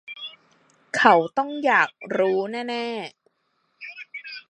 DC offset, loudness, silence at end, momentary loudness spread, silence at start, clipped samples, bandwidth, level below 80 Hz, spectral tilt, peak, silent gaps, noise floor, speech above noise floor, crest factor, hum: under 0.1%; -22 LUFS; 0.1 s; 21 LU; 0.1 s; under 0.1%; 11.5 kHz; -76 dBFS; -4.5 dB/octave; 0 dBFS; none; -71 dBFS; 49 dB; 24 dB; none